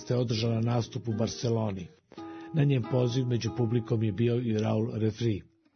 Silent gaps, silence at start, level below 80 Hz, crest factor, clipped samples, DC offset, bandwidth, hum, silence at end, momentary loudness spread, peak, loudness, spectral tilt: none; 0 s; -62 dBFS; 16 dB; under 0.1%; under 0.1%; 6.6 kHz; none; 0.3 s; 10 LU; -12 dBFS; -29 LUFS; -7 dB/octave